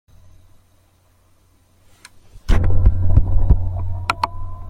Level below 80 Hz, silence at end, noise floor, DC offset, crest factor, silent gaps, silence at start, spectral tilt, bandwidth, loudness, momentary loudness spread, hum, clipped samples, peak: -22 dBFS; 0 s; -56 dBFS; under 0.1%; 16 dB; none; 2.35 s; -7 dB/octave; 9.6 kHz; -20 LUFS; 8 LU; none; under 0.1%; -2 dBFS